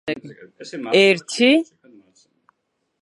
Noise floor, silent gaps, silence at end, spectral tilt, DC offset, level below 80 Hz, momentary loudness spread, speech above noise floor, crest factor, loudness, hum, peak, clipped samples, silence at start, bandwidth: -74 dBFS; none; 1.4 s; -4 dB/octave; under 0.1%; -74 dBFS; 21 LU; 55 dB; 20 dB; -17 LUFS; none; -2 dBFS; under 0.1%; 0.05 s; 11 kHz